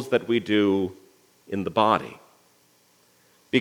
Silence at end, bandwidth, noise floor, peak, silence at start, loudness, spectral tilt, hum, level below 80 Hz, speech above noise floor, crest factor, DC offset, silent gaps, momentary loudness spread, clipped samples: 0 s; 17.5 kHz; -61 dBFS; -4 dBFS; 0 s; -24 LUFS; -6 dB/octave; 60 Hz at -55 dBFS; -72 dBFS; 38 dB; 22 dB; under 0.1%; none; 11 LU; under 0.1%